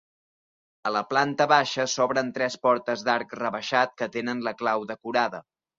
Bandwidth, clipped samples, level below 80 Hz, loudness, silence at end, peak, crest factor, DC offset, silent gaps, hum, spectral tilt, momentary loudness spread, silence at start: 7.8 kHz; under 0.1%; -72 dBFS; -25 LUFS; 0.4 s; -6 dBFS; 20 dB; under 0.1%; none; none; -3.5 dB/octave; 9 LU; 0.85 s